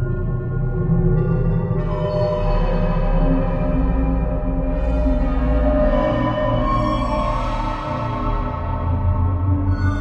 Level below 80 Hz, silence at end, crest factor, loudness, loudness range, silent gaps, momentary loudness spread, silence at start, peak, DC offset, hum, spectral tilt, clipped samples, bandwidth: -22 dBFS; 0 s; 12 dB; -21 LUFS; 2 LU; none; 5 LU; 0 s; -6 dBFS; under 0.1%; none; -9.5 dB/octave; under 0.1%; 6 kHz